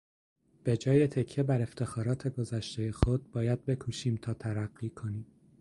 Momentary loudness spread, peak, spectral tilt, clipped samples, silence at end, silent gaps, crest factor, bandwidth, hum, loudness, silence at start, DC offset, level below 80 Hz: 11 LU; -8 dBFS; -7.5 dB/octave; under 0.1%; 0.35 s; none; 24 dB; 11.5 kHz; none; -32 LUFS; 0.65 s; under 0.1%; -46 dBFS